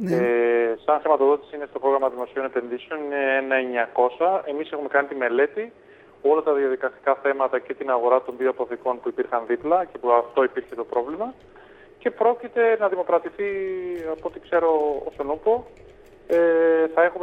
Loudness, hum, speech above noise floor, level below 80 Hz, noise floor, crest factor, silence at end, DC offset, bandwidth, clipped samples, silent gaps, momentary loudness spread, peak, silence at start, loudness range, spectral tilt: -23 LUFS; none; 26 dB; -62 dBFS; -48 dBFS; 18 dB; 0 s; under 0.1%; 5 kHz; under 0.1%; none; 10 LU; -4 dBFS; 0 s; 2 LU; -7 dB/octave